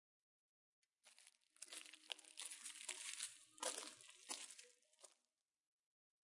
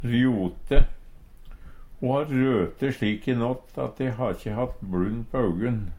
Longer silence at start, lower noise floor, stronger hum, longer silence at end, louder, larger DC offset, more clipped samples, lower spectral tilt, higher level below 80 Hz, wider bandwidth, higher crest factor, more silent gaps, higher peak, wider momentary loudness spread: first, 1.05 s vs 0 s; first, under -90 dBFS vs -45 dBFS; neither; first, 1.1 s vs 0 s; second, -51 LUFS vs -27 LUFS; neither; neither; second, 2.5 dB/octave vs -8.5 dB/octave; second, under -90 dBFS vs -30 dBFS; first, 12 kHz vs 10 kHz; first, 30 dB vs 20 dB; neither; second, -28 dBFS vs -4 dBFS; first, 20 LU vs 7 LU